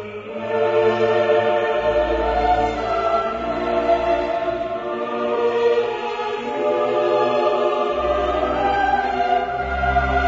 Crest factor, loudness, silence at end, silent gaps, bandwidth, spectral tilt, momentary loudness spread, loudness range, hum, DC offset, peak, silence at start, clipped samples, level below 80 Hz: 14 dB; -20 LUFS; 0 s; none; 7.8 kHz; -6 dB/octave; 7 LU; 2 LU; none; under 0.1%; -6 dBFS; 0 s; under 0.1%; -36 dBFS